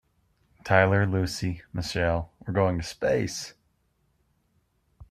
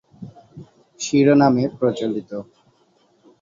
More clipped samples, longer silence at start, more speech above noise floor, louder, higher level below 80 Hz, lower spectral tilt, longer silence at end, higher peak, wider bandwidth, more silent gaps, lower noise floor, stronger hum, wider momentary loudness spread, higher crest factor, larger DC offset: neither; first, 0.65 s vs 0.2 s; about the same, 45 dB vs 42 dB; second, -26 LUFS vs -18 LUFS; first, -50 dBFS vs -60 dBFS; about the same, -5.5 dB/octave vs -6 dB/octave; second, 0.05 s vs 1 s; about the same, -4 dBFS vs -2 dBFS; first, 14 kHz vs 7.6 kHz; neither; first, -70 dBFS vs -60 dBFS; neither; second, 12 LU vs 26 LU; first, 24 dB vs 18 dB; neither